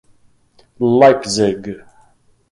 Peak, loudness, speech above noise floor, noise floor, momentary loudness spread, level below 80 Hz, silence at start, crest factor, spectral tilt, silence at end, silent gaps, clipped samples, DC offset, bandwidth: 0 dBFS; -14 LUFS; 40 dB; -53 dBFS; 19 LU; -54 dBFS; 0.8 s; 16 dB; -5 dB/octave; 0.75 s; none; under 0.1%; under 0.1%; 11.5 kHz